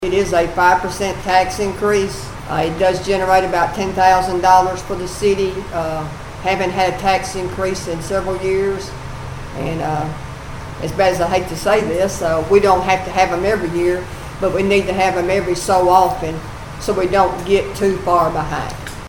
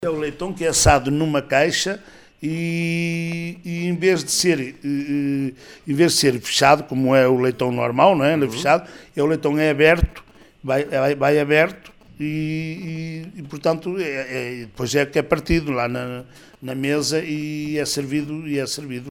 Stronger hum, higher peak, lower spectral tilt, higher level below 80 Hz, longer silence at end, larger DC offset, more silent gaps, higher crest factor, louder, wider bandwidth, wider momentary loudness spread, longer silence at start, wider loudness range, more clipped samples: neither; about the same, 0 dBFS vs 0 dBFS; about the same, -5 dB/octave vs -4.5 dB/octave; about the same, -34 dBFS vs -38 dBFS; about the same, 0 s vs 0 s; first, 0.4% vs under 0.1%; neither; about the same, 16 dB vs 20 dB; first, -17 LUFS vs -20 LUFS; about the same, 19.5 kHz vs 19.5 kHz; about the same, 12 LU vs 13 LU; about the same, 0 s vs 0 s; about the same, 5 LU vs 6 LU; neither